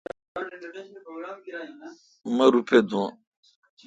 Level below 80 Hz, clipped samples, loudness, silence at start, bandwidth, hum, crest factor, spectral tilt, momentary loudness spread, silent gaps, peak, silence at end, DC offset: -70 dBFS; under 0.1%; -23 LUFS; 0.35 s; 9 kHz; none; 22 dB; -5.5 dB/octave; 22 LU; none; -6 dBFS; 0.75 s; under 0.1%